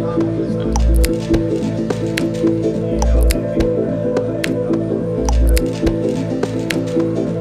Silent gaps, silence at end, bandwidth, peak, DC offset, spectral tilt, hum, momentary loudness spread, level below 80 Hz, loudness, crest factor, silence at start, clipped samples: none; 0 s; 15 kHz; -2 dBFS; under 0.1%; -6.5 dB/octave; none; 4 LU; -20 dBFS; -18 LUFS; 16 dB; 0 s; under 0.1%